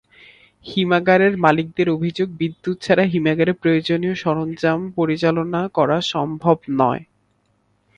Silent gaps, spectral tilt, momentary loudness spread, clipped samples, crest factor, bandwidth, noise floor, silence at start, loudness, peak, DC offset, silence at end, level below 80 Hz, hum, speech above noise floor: none; -7 dB/octave; 8 LU; under 0.1%; 20 dB; 9.6 kHz; -64 dBFS; 0.65 s; -19 LUFS; 0 dBFS; under 0.1%; 0.95 s; -56 dBFS; none; 45 dB